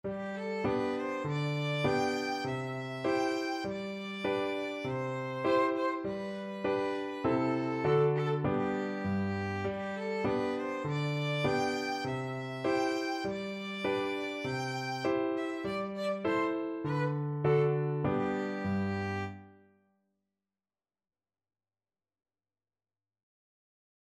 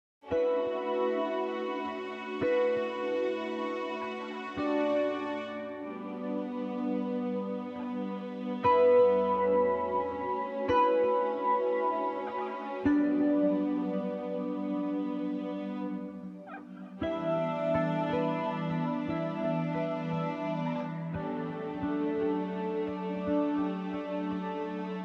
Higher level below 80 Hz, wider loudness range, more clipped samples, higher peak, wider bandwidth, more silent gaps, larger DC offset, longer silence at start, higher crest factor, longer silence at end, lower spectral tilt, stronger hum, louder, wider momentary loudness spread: about the same, -64 dBFS vs -64 dBFS; second, 3 LU vs 6 LU; neither; about the same, -16 dBFS vs -14 dBFS; first, 13.5 kHz vs 7 kHz; neither; neither; second, 0.05 s vs 0.25 s; about the same, 18 dB vs 16 dB; first, 4.6 s vs 0 s; second, -6.5 dB/octave vs -8.5 dB/octave; neither; about the same, -33 LUFS vs -31 LUFS; second, 7 LU vs 10 LU